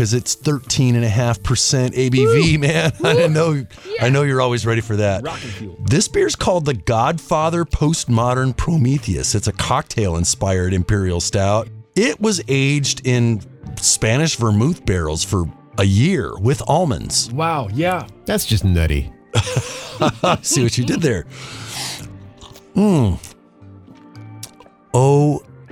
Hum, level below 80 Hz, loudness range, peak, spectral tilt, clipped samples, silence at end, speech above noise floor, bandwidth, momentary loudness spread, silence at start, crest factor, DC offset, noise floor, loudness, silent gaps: none; -34 dBFS; 4 LU; -2 dBFS; -5 dB/octave; under 0.1%; 0.05 s; 26 dB; 17 kHz; 10 LU; 0 s; 16 dB; under 0.1%; -43 dBFS; -18 LUFS; none